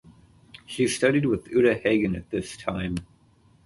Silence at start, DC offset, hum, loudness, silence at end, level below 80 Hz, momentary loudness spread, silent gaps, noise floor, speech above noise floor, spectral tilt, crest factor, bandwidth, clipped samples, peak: 0.7 s; under 0.1%; none; -25 LUFS; 0.6 s; -50 dBFS; 11 LU; none; -59 dBFS; 35 dB; -5.5 dB/octave; 18 dB; 11.5 kHz; under 0.1%; -8 dBFS